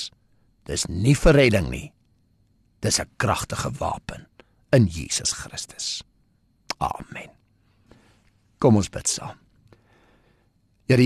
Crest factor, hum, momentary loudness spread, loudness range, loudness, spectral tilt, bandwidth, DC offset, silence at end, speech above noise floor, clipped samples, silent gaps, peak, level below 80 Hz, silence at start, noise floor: 20 dB; none; 18 LU; 7 LU; -23 LUFS; -4.5 dB/octave; 13 kHz; under 0.1%; 0 s; 41 dB; under 0.1%; none; -6 dBFS; -38 dBFS; 0 s; -64 dBFS